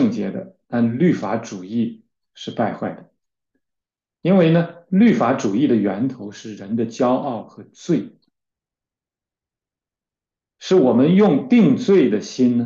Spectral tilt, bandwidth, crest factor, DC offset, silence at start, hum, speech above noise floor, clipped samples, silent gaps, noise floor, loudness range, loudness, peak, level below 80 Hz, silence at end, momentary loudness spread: -7.5 dB/octave; 7.4 kHz; 14 dB; under 0.1%; 0 s; none; 72 dB; under 0.1%; none; -89 dBFS; 9 LU; -18 LUFS; -4 dBFS; -64 dBFS; 0 s; 16 LU